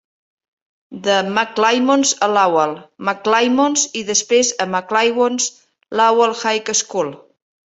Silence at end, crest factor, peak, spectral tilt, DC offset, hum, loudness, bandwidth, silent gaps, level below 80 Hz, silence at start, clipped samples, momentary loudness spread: 0.55 s; 16 dB; -2 dBFS; -2 dB/octave; under 0.1%; none; -16 LUFS; 8.4 kHz; none; -66 dBFS; 0.9 s; under 0.1%; 8 LU